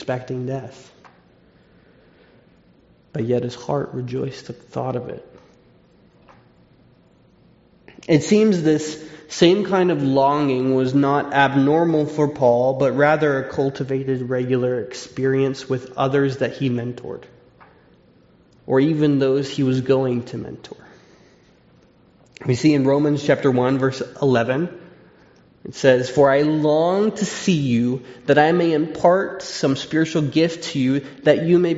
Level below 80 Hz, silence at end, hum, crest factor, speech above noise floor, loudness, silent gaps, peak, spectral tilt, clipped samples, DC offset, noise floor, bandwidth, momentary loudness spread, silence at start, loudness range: -60 dBFS; 0 s; none; 18 dB; 35 dB; -19 LUFS; none; -2 dBFS; -5.5 dB/octave; under 0.1%; under 0.1%; -54 dBFS; 8 kHz; 14 LU; 0 s; 11 LU